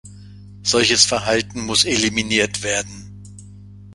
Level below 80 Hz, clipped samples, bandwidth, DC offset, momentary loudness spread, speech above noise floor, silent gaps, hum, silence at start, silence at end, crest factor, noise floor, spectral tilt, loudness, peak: -46 dBFS; under 0.1%; 11.5 kHz; under 0.1%; 10 LU; 21 dB; none; 50 Hz at -35 dBFS; 0.05 s; 0 s; 20 dB; -40 dBFS; -2 dB/octave; -17 LUFS; 0 dBFS